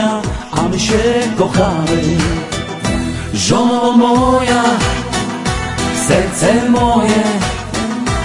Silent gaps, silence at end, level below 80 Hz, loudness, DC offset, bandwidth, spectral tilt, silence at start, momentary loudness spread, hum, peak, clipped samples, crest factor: none; 0 s; -28 dBFS; -14 LUFS; under 0.1%; 11.5 kHz; -5 dB/octave; 0 s; 8 LU; none; 0 dBFS; under 0.1%; 14 dB